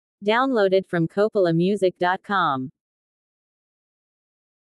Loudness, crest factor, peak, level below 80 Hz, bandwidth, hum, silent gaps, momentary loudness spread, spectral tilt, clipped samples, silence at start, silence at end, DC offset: -21 LUFS; 16 dB; -8 dBFS; -72 dBFS; 11.5 kHz; none; none; 5 LU; -7 dB/octave; under 0.1%; 0.2 s; 2 s; under 0.1%